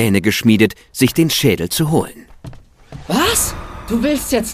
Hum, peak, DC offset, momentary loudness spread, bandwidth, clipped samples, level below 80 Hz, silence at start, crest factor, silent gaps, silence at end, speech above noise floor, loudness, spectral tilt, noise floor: none; 0 dBFS; under 0.1%; 8 LU; 15.5 kHz; under 0.1%; -36 dBFS; 0 s; 16 dB; none; 0 s; 21 dB; -16 LUFS; -4.5 dB/octave; -36 dBFS